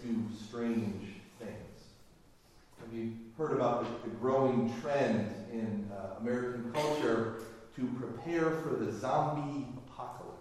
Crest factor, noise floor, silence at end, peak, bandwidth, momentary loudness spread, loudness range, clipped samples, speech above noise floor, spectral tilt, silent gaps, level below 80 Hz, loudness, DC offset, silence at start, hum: 18 dB; -61 dBFS; 0 s; -18 dBFS; 13.5 kHz; 15 LU; 5 LU; under 0.1%; 27 dB; -7 dB/octave; none; -66 dBFS; -35 LUFS; under 0.1%; 0 s; none